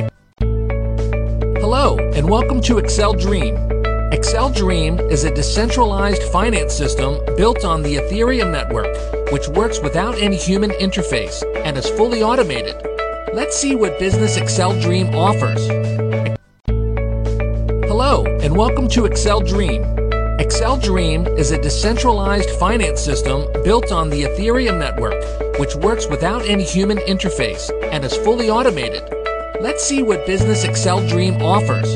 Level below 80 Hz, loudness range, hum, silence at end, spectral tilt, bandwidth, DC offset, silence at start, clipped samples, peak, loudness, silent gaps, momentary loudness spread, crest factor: -22 dBFS; 2 LU; none; 0 s; -5 dB/octave; 10.5 kHz; under 0.1%; 0 s; under 0.1%; -2 dBFS; -17 LUFS; none; 6 LU; 14 dB